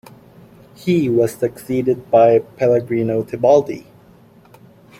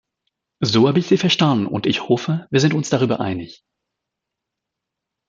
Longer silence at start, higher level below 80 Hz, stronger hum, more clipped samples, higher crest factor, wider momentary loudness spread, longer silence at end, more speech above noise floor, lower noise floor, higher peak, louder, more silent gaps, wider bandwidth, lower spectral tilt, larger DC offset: first, 0.85 s vs 0.6 s; about the same, -56 dBFS vs -60 dBFS; neither; neither; about the same, 16 dB vs 18 dB; about the same, 10 LU vs 9 LU; second, 1.2 s vs 1.75 s; second, 31 dB vs 65 dB; second, -47 dBFS vs -82 dBFS; about the same, -2 dBFS vs -2 dBFS; about the same, -17 LUFS vs -18 LUFS; neither; first, 16 kHz vs 7.8 kHz; first, -7.5 dB/octave vs -5.5 dB/octave; neither